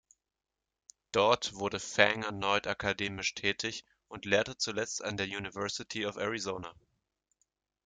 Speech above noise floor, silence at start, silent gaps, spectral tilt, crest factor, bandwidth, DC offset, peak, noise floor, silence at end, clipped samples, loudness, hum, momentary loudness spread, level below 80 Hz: 56 dB; 1.15 s; none; -3 dB/octave; 28 dB; 9.6 kHz; under 0.1%; -6 dBFS; -89 dBFS; 1.15 s; under 0.1%; -32 LUFS; none; 11 LU; -66 dBFS